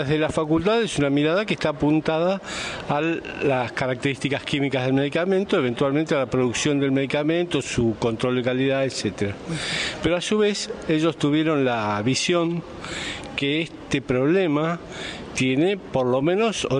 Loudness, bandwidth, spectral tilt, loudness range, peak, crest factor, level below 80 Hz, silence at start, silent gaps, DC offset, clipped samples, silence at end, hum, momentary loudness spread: -23 LUFS; 10.5 kHz; -5 dB/octave; 2 LU; -8 dBFS; 14 dB; -50 dBFS; 0 s; none; under 0.1%; under 0.1%; 0 s; none; 7 LU